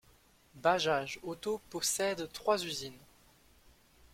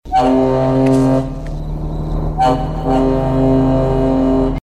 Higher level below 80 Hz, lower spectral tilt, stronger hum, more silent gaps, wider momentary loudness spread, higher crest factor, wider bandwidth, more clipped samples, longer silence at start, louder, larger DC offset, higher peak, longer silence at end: second, -68 dBFS vs -24 dBFS; second, -2.5 dB/octave vs -8.5 dB/octave; neither; neither; about the same, 10 LU vs 11 LU; first, 22 dB vs 12 dB; first, 16.5 kHz vs 10.5 kHz; neither; first, 0.55 s vs 0.05 s; second, -34 LUFS vs -15 LUFS; neither; second, -14 dBFS vs -2 dBFS; first, 1.15 s vs 0.05 s